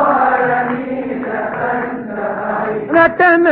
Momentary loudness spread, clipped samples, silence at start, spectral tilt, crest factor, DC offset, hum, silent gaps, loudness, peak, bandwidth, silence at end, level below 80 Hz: 11 LU; under 0.1%; 0 s; -9 dB/octave; 14 dB; under 0.1%; none; none; -15 LUFS; 0 dBFS; 4.9 kHz; 0 s; -50 dBFS